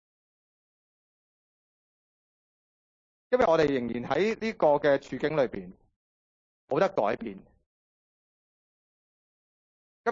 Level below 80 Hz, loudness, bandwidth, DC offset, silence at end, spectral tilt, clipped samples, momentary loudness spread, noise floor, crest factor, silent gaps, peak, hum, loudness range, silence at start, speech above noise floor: -62 dBFS; -27 LUFS; 7.6 kHz; under 0.1%; 0 s; -6.5 dB/octave; under 0.1%; 10 LU; under -90 dBFS; 20 dB; 5.96-6.68 s, 7.66-10.04 s; -12 dBFS; none; 7 LU; 3.3 s; over 64 dB